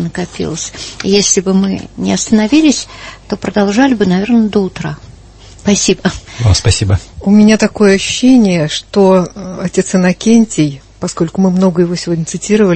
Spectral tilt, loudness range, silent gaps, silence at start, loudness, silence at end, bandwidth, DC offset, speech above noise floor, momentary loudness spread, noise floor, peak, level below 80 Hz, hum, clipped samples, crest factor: -5 dB/octave; 3 LU; none; 0 s; -12 LUFS; 0 s; 8.8 kHz; under 0.1%; 25 dB; 12 LU; -36 dBFS; 0 dBFS; -34 dBFS; none; under 0.1%; 12 dB